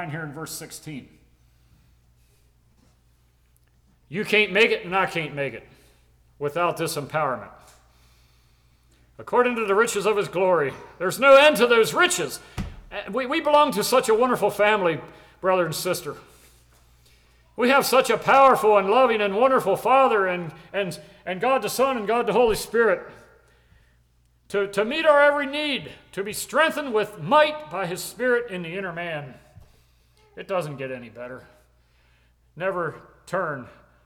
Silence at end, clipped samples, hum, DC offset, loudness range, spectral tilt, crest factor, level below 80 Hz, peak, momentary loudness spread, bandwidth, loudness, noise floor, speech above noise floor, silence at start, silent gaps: 0.35 s; under 0.1%; none; under 0.1%; 13 LU; -3.5 dB/octave; 18 dB; -54 dBFS; -6 dBFS; 17 LU; 19.5 kHz; -21 LUFS; -62 dBFS; 40 dB; 0 s; none